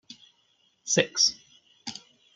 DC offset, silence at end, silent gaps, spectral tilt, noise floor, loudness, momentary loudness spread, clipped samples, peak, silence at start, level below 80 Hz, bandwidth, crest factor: under 0.1%; 0.35 s; none; -1.5 dB/octave; -68 dBFS; -24 LUFS; 22 LU; under 0.1%; -6 dBFS; 0.1 s; -74 dBFS; 11 kHz; 26 dB